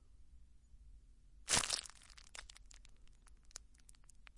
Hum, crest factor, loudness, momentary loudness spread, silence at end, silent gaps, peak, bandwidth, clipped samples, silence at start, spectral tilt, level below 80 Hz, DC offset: none; 30 dB; -37 LUFS; 28 LU; 0 s; none; -16 dBFS; 11.5 kHz; under 0.1%; 0 s; 0 dB/octave; -62 dBFS; under 0.1%